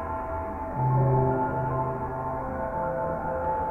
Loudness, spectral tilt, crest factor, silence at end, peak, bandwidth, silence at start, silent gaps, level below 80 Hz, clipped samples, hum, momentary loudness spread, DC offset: -28 LUFS; -11 dB/octave; 14 dB; 0 s; -12 dBFS; 2.8 kHz; 0 s; none; -42 dBFS; under 0.1%; none; 9 LU; under 0.1%